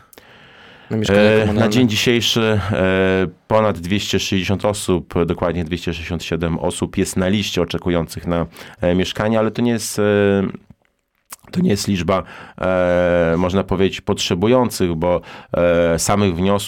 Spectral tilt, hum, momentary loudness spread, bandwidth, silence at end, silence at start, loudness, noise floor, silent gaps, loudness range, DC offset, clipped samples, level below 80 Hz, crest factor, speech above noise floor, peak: -5 dB/octave; none; 8 LU; 17.5 kHz; 0 s; 0.9 s; -18 LUFS; -65 dBFS; none; 4 LU; 0.2%; under 0.1%; -40 dBFS; 16 dB; 48 dB; -2 dBFS